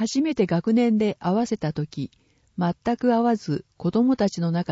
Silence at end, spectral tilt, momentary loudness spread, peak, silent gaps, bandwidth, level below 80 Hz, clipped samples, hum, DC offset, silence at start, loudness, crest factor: 0 s; -7 dB/octave; 10 LU; -8 dBFS; none; 8 kHz; -58 dBFS; under 0.1%; none; under 0.1%; 0 s; -23 LUFS; 14 dB